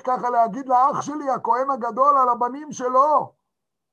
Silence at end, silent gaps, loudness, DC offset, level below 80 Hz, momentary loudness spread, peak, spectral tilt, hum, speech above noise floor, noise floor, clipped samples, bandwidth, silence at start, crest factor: 0.65 s; none; -20 LUFS; under 0.1%; -74 dBFS; 9 LU; -6 dBFS; -5.5 dB/octave; none; 62 dB; -82 dBFS; under 0.1%; 9.2 kHz; 0.05 s; 16 dB